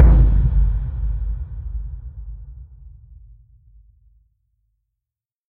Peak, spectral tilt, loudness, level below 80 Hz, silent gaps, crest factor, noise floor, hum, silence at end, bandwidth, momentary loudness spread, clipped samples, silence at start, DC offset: 0 dBFS; -11 dB/octave; -21 LUFS; -20 dBFS; none; 20 dB; -86 dBFS; none; 2.7 s; 2.2 kHz; 24 LU; under 0.1%; 0 s; under 0.1%